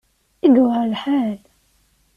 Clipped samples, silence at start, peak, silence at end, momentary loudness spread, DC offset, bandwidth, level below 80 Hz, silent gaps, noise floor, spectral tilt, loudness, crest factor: under 0.1%; 0.45 s; -4 dBFS; 0.8 s; 11 LU; under 0.1%; 5.2 kHz; -60 dBFS; none; -60 dBFS; -7.5 dB/octave; -18 LUFS; 16 dB